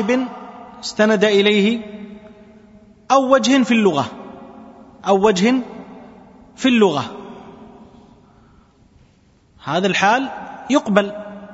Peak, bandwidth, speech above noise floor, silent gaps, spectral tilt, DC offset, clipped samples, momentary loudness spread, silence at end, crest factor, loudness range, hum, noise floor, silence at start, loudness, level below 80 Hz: 0 dBFS; 8 kHz; 38 dB; none; -5 dB/octave; under 0.1%; under 0.1%; 23 LU; 0 s; 20 dB; 6 LU; none; -54 dBFS; 0 s; -17 LUFS; -58 dBFS